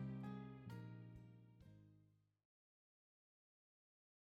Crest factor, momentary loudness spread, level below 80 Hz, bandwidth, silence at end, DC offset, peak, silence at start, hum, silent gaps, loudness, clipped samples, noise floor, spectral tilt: 18 dB; 15 LU; -78 dBFS; 8.4 kHz; 2.15 s; under 0.1%; -40 dBFS; 0 s; none; none; -56 LUFS; under 0.1%; -76 dBFS; -8.5 dB/octave